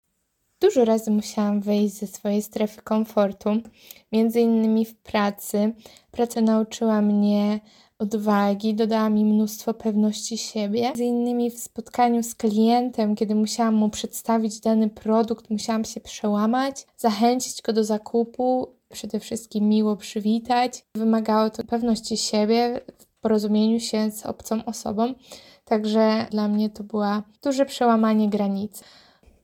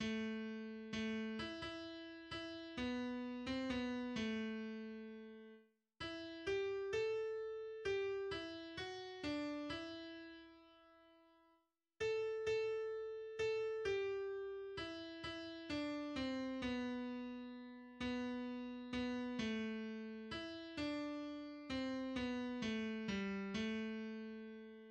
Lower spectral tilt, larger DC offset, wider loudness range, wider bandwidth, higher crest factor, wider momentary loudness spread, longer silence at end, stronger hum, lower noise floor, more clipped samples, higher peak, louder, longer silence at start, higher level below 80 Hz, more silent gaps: about the same, -5.5 dB/octave vs -5 dB/octave; neither; about the same, 2 LU vs 3 LU; first, 16.5 kHz vs 9.4 kHz; about the same, 16 dB vs 16 dB; about the same, 8 LU vs 10 LU; first, 0.65 s vs 0 s; neither; second, -73 dBFS vs -80 dBFS; neither; first, -6 dBFS vs -30 dBFS; first, -23 LUFS vs -45 LUFS; first, 0.6 s vs 0 s; first, -62 dBFS vs -68 dBFS; neither